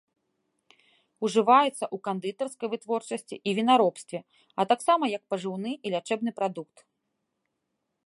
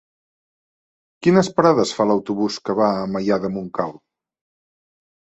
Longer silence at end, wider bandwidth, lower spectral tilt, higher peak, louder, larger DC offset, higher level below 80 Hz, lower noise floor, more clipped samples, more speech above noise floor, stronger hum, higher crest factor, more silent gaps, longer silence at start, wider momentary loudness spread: about the same, 1.4 s vs 1.45 s; first, 11.5 kHz vs 8.2 kHz; second, -4.5 dB/octave vs -6 dB/octave; second, -6 dBFS vs -2 dBFS; second, -27 LUFS vs -20 LUFS; neither; second, -82 dBFS vs -60 dBFS; second, -81 dBFS vs under -90 dBFS; neither; second, 54 dB vs over 71 dB; neither; about the same, 22 dB vs 20 dB; neither; about the same, 1.2 s vs 1.2 s; first, 14 LU vs 9 LU